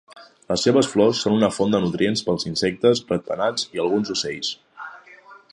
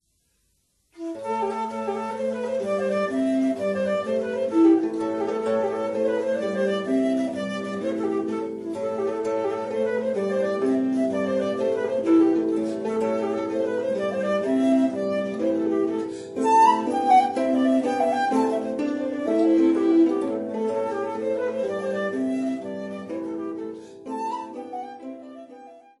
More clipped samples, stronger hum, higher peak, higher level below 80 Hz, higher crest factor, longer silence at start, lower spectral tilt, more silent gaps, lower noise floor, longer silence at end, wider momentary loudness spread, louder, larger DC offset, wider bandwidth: neither; neither; about the same, -4 dBFS vs -6 dBFS; first, -56 dBFS vs -72 dBFS; about the same, 18 dB vs 16 dB; second, 0.15 s vs 0.95 s; second, -4.5 dB/octave vs -6 dB/octave; neither; second, -47 dBFS vs -69 dBFS; about the same, 0.2 s vs 0.2 s; second, 10 LU vs 13 LU; first, -21 LUFS vs -24 LUFS; neither; about the same, 11.5 kHz vs 11.5 kHz